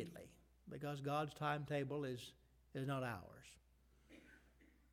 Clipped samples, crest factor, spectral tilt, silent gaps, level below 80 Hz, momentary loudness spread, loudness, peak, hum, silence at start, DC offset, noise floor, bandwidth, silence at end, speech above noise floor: under 0.1%; 20 dB; -6.5 dB/octave; none; -72 dBFS; 22 LU; -45 LUFS; -28 dBFS; none; 0 s; under 0.1%; -71 dBFS; 16 kHz; 0.3 s; 26 dB